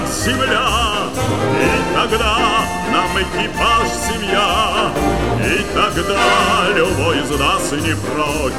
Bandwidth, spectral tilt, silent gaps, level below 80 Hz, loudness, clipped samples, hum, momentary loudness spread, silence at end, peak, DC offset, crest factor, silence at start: 16.5 kHz; -4 dB/octave; none; -30 dBFS; -16 LUFS; under 0.1%; none; 5 LU; 0 s; -2 dBFS; 2%; 14 dB; 0 s